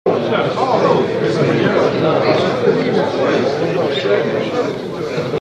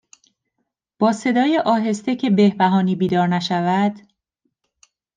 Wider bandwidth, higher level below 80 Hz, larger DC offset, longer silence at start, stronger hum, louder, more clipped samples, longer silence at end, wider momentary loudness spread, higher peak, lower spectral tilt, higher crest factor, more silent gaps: about the same, 9.8 kHz vs 9.4 kHz; first, -52 dBFS vs -66 dBFS; neither; second, 0.05 s vs 1 s; neither; about the same, -16 LUFS vs -18 LUFS; neither; second, 0 s vs 1.15 s; about the same, 6 LU vs 5 LU; about the same, -2 dBFS vs -4 dBFS; about the same, -6.5 dB/octave vs -6.5 dB/octave; about the same, 14 dB vs 16 dB; neither